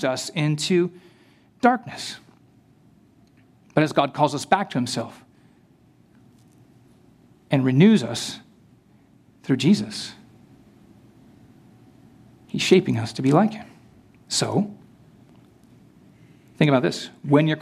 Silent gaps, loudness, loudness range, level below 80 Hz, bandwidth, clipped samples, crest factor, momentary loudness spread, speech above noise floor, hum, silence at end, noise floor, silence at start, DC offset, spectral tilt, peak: none; -22 LUFS; 5 LU; -66 dBFS; 14 kHz; under 0.1%; 22 dB; 15 LU; 35 dB; none; 0 s; -56 dBFS; 0 s; under 0.1%; -5.5 dB/octave; -2 dBFS